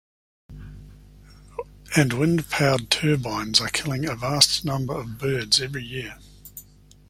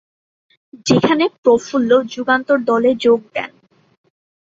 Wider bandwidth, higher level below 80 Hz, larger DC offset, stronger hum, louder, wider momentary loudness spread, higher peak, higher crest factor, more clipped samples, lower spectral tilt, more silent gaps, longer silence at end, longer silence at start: first, 16.5 kHz vs 7.8 kHz; first, -48 dBFS vs -58 dBFS; neither; first, 50 Hz at -45 dBFS vs none; second, -22 LUFS vs -16 LUFS; first, 24 LU vs 12 LU; about the same, 0 dBFS vs 0 dBFS; first, 26 dB vs 16 dB; neither; second, -3.5 dB/octave vs -5 dB/octave; second, none vs 1.38-1.43 s; second, 0.45 s vs 0.95 s; second, 0.5 s vs 0.75 s